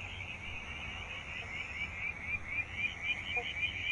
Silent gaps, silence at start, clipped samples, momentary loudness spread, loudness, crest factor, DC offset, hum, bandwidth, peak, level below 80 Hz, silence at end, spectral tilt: none; 0 s; under 0.1%; 8 LU; -37 LUFS; 16 dB; under 0.1%; none; 11.5 kHz; -24 dBFS; -54 dBFS; 0 s; -3 dB/octave